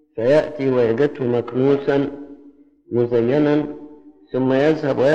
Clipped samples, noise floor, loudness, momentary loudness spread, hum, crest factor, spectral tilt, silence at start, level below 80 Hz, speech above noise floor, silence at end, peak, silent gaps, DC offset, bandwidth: under 0.1%; -48 dBFS; -19 LUFS; 10 LU; none; 14 dB; -8 dB/octave; 0.15 s; -54 dBFS; 30 dB; 0 s; -4 dBFS; none; under 0.1%; 8 kHz